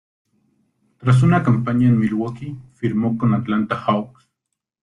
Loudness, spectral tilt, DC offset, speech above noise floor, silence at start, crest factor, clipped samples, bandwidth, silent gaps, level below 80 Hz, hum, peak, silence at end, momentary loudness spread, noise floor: -19 LUFS; -8.5 dB/octave; under 0.1%; 62 dB; 1 s; 16 dB; under 0.1%; 10 kHz; none; -52 dBFS; none; -4 dBFS; 0.75 s; 12 LU; -80 dBFS